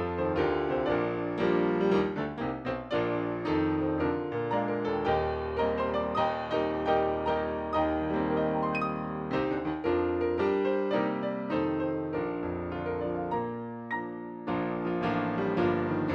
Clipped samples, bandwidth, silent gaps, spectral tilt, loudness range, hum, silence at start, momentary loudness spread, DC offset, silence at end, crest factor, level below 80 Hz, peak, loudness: under 0.1%; 7 kHz; none; -8.5 dB/octave; 3 LU; none; 0 s; 6 LU; under 0.1%; 0 s; 16 dB; -52 dBFS; -14 dBFS; -30 LUFS